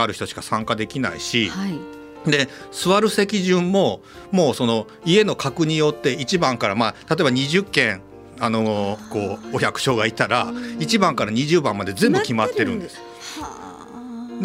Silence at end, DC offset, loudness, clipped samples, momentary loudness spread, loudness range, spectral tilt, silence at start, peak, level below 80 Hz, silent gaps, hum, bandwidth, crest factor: 0 s; under 0.1%; -20 LUFS; under 0.1%; 14 LU; 2 LU; -4.5 dB/octave; 0 s; 0 dBFS; -54 dBFS; none; none; 16 kHz; 20 dB